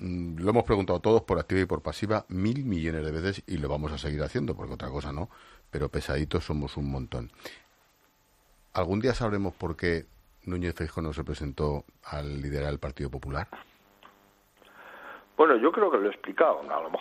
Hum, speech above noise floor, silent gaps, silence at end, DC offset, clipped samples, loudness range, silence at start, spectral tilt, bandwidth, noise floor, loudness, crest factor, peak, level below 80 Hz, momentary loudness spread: none; 37 dB; none; 0 s; under 0.1%; under 0.1%; 7 LU; 0 s; -7 dB/octave; 14 kHz; -65 dBFS; -29 LUFS; 24 dB; -6 dBFS; -44 dBFS; 14 LU